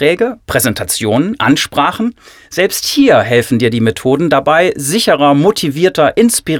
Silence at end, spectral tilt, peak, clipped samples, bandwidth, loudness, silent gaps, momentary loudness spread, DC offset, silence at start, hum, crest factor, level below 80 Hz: 0 s; -4 dB/octave; 0 dBFS; under 0.1%; 20 kHz; -12 LUFS; none; 6 LU; under 0.1%; 0 s; none; 12 dB; -44 dBFS